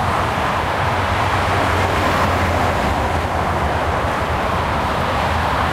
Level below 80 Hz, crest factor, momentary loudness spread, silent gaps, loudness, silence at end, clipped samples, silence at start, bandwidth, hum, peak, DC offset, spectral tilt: -30 dBFS; 14 dB; 3 LU; none; -18 LUFS; 0 s; under 0.1%; 0 s; 16 kHz; none; -4 dBFS; under 0.1%; -5.5 dB/octave